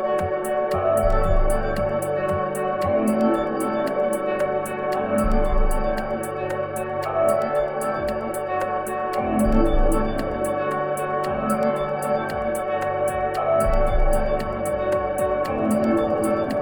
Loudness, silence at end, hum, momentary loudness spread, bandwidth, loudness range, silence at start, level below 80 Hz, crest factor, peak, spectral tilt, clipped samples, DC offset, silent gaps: -23 LUFS; 0 s; 50 Hz at -55 dBFS; 5 LU; 20 kHz; 2 LU; 0 s; -28 dBFS; 16 dB; -6 dBFS; -6 dB/octave; under 0.1%; under 0.1%; none